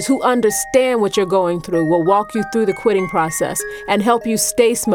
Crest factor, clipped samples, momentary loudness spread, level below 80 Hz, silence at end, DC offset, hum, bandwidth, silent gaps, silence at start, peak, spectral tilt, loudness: 16 dB; under 0.1%; 5 LU; -48 dBFS; 0 s; under 0.1%; none; 18.5 kHz; none; 0 s; 0 dBFS; -4 dB/octave; -16 LUFS